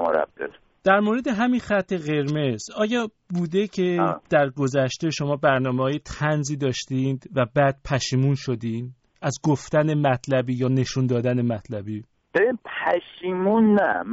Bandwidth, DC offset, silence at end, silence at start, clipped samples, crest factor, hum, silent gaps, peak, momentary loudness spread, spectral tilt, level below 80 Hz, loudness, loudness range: 8 kHz; under 0.1%; 0 s; 0 s; under 0.1%; 18 dB; none; none; -4 dBFS; 9 LU; -5.5 dB/octave; -54 dBFS; -23 LUFS; 1 LU